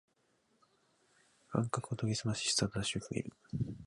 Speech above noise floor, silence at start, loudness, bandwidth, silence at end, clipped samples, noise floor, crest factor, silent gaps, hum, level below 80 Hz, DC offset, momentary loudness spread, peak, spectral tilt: 39 dB; 1.5 s; -36 LUFS; 11.5 kHz; 0 s; under 0.1%; -75 dBFS; 22 dB; none; none; -62 dBFS; under 0.1%; 9 LU; -16 dBFS; -4 dB/octave